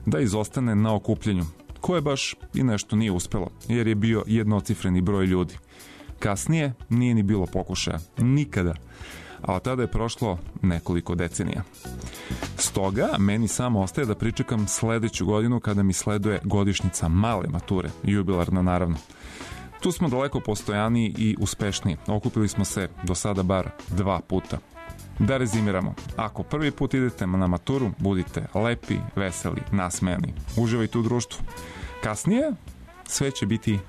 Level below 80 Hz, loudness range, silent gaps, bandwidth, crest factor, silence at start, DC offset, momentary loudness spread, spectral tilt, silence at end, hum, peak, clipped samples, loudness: -42 dBFS; 3 LU; none; 13.5 kHz; 14 dB; 0 s; under 0.1%; 10 LU; -5.5 dB/octave; 0 s; none; -10 dBFS; under 0.1%; -25 LUFS